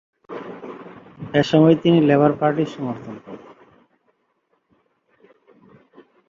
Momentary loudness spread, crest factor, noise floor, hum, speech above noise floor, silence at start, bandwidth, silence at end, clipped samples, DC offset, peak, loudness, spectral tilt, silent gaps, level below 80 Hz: 24 LU; 20 dB; -68 dBFS; none; 51 dB; 0.3 s; 7.4 kHz; 2.9 s; under 0.1%; under 0.1%; -2 dBFS; -17 LUFS; -8 dB/octave; none; -60 dBFS